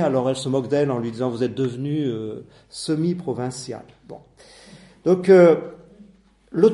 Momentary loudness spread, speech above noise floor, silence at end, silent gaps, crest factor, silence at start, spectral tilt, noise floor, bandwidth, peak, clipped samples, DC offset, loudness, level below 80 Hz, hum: 21 LU; 32 dB; 0 s; none; 18 dB; 0 s; -7 dB/octave; -53 dBFS; 11.5 kHz; -2 dBFS; under 0.1%; under 0.1%; -21 LUFS; -60 dBFS; none